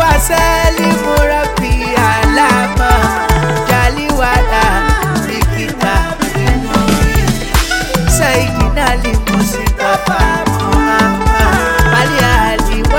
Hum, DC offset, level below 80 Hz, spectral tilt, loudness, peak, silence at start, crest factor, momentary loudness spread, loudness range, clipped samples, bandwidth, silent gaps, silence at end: none; 0.2%; -16 dBFS; -4.5 dB/octave; -12 LUFS; 0 dBFS; 0 s; 12 dB; 4 LU; 2 LU; under 0.1%; 17 kHz; none; 0 s